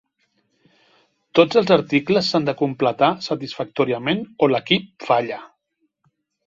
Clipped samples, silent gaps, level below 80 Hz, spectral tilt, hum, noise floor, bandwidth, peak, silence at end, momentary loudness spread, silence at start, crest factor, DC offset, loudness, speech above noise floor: under 0.1%; none; -62 dBFS; -6 dB/octave; none; -71 dBFS; 7.6 kHz; -2 dBFS; 1 s; 10 LU; 1.35 s; 20 dB; under 0.1%; -20 LUFS; 52 dB